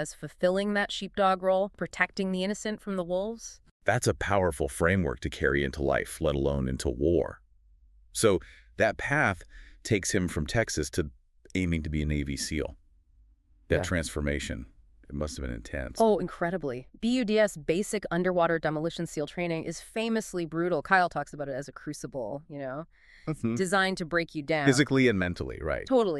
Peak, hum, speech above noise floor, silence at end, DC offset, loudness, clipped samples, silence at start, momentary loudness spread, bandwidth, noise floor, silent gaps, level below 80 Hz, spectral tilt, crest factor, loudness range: -8 dBFS; none; 33 dB; 0 s; under 0.1%; -29 LUFS; under 0.1%; 0 s; 12 LU; 13.5 kHz; -61 dBFS; 3.71-3.80 s; -46 dBFS; -5 dB/octave; 20 dB; 4 LU